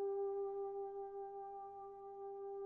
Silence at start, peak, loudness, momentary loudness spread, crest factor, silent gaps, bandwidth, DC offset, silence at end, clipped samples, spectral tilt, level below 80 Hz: 0 s; -36 dBFS; -47 LUFS; 10 LU; 10 dB; none; 2.1 kHz; under 0.1%; 0 s; under 0.1%; -7.5 dB/octave; -80 dBFS